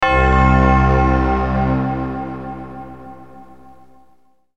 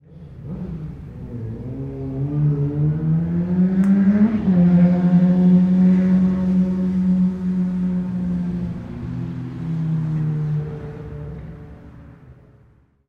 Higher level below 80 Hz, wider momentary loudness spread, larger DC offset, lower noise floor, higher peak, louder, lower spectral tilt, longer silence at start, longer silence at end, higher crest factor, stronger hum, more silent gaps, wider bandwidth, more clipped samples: first, -22 dBFS vs -42 dBFS; first, 21 LU vs 18 LU; first, 0.7% vs under 0.1%; about the same, -56 dBFS vs -54 dBFS; first, 0 dBFS vs -6 dBFS; first, -16 LUFS vs -19 LUFS; second, -8 dB/octave vs -11 dB/octave; about the same, 0 s vs 0.1 s; first, 1.15 s vs 0.75 s; about the same, 16 dB vs 14 dB; neither; neither; first, 7.4 kHz vs 3.7 kHz; neither